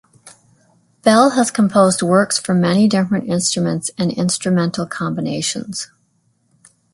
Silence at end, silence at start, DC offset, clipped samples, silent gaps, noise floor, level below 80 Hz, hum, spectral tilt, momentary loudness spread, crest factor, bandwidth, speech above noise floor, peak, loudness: 1.1 s; 0.25 s; under 0.1%; under 0.1%; none; -62 dBFS; -56 dBFS; none; -5 dB/octave; 9 LU; 18 dB; 11.5 kHz; 46 dB; 0 dBFS; -16 LUFS